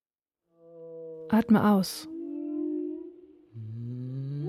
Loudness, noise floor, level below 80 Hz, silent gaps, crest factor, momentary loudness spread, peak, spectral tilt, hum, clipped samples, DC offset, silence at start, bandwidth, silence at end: -28 LUFS; -86 dBFS; -66 dBFS; none; 18 dB; 23 LU; -12 dBFS; -6.5 dB/octave; none; under 0.1%; under 0.1%; 0.65 s; 14.5 kHz; 0 s